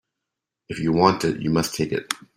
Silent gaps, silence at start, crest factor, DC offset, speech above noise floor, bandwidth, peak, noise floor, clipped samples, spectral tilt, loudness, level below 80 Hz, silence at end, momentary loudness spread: none; 0.7 s; 22 dB; under 0.1%; 62 dB; 16 kHz; -2 dBFS; -84 dBFS; under 0.1%; -5 dB/octave; -22 LUFS; -52 dBFS; 0.2 s; 9 LU